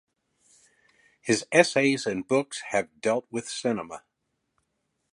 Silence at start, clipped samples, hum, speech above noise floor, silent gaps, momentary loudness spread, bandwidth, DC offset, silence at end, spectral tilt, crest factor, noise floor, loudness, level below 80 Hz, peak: 1.25 s; under 0.1%; none; 53 dB; none; 12 LU; 11.5 kHz; under 0.1%; 1.15 s; -4 dB/octave; 26 dB; -79 dBFS; -26 LUFS; -70 dBFS; -4 dBFS